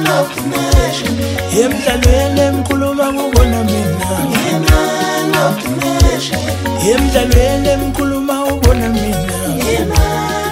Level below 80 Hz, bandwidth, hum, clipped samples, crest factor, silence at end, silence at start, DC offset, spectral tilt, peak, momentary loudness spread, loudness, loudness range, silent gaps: -20 dBFS; 16.5 kHz; none; under 0.1%; 12 dB; 0 s; 0 s; under 0.1%; -5 dB/octave; 0 dBFS; 5 LU; -14 LUFS; 1 LU; none